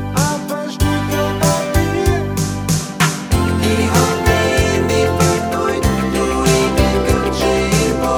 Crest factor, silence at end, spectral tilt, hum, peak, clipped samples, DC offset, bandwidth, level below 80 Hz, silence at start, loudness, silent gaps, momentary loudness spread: 16 dB; 0 s; -5 dB/octave; none; 0 dBFS; under 0.1%; under 0.1%; over 20 kHz; -26 dBFS; 0 s; -16 LUFS; none; 4 LU